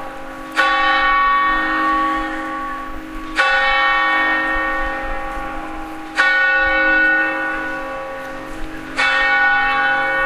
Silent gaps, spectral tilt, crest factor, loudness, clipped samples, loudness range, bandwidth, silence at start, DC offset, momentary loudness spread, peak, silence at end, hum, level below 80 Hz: none; -3 dB/octave; 18 dB; -16 LUFS; under 0.1%; 1 LU; 15 kHz; 0 s; under 0.1%; 15 LU; 0 dBFS; 0 s; none; -34 dBFS